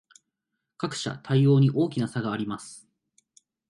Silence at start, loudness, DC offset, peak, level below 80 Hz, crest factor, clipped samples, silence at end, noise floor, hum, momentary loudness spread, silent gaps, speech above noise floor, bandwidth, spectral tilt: 0.8 s; -25 LUFS; under 0.1%; -10 dBFS; -68 dBFS; 16 dB; under 0.1%; 0.9 s; -83 dBFS; none; 15 LU; none; 59 dB; 11.5 kHz; -7 dB/octave